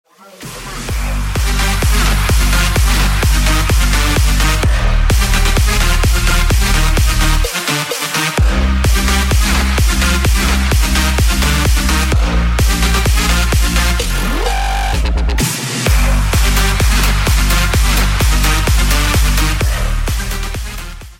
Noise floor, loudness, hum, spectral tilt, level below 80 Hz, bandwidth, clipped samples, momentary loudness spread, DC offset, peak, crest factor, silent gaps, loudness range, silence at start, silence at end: -33 dBFS; -14 LUFS; none; -3.5 dB/octave; -14 dBFS; 16.5 kHz; under 0.1%; 5 LU; under 0.1%; 0 dBFS; 12 dB; none; 2 LU; 0.4 s; 0.05 s